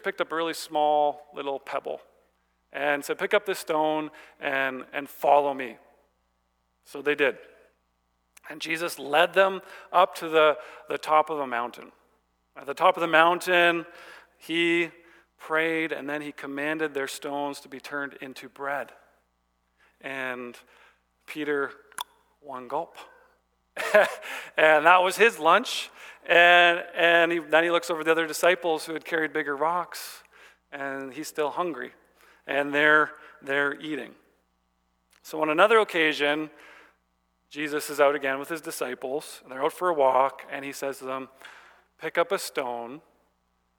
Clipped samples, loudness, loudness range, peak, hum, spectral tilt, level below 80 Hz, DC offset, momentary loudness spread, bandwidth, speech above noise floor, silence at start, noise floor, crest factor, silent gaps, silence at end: under 0.1%; -25 LUFS; 13 LU; -4 dBFS; 60 Hz at -70 dBFS; -3 dB/octave; -76 dBFS; under 0.1%; 18 LU; 20 kHz; 47 dB; 0.05 s; -73 dBFS; 24 dB; none; 0.8 s